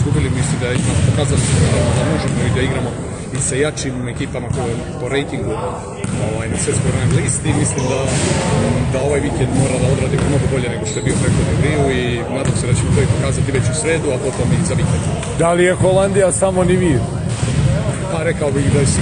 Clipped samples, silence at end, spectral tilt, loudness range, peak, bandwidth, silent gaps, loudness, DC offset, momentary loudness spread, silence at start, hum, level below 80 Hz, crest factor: under 0.1%; 0 s; -5.5 dB/octave; 5 LU; -2 dBFS; 10 kHz; none; -17 LUFS; under 0.1%; 7 LU; 0 s; none; -30 dBFS; 14 dB